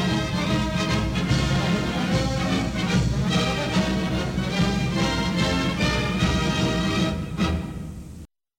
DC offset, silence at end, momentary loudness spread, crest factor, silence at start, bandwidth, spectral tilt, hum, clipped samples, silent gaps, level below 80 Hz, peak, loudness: under 0.1%; 0.35 s; 3 LU; 14 dB; 0 s; 16.5 kHz; -5.5 dB/octave; none; under 0.1%; none; -34 dBFS; -8 dBFS; -23 LUFS